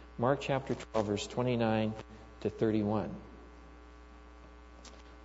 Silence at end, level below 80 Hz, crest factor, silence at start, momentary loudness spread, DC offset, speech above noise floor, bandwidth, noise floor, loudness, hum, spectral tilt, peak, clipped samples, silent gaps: 0 s; -54 dBFS; 22 dB; 0 s; 24 LU; under 0.1%; 21 dB; 8 kHz; -53 dBFS; -33 LUFS; none; -6.5 dB/octave; -14 dBFS; under 0.1%; none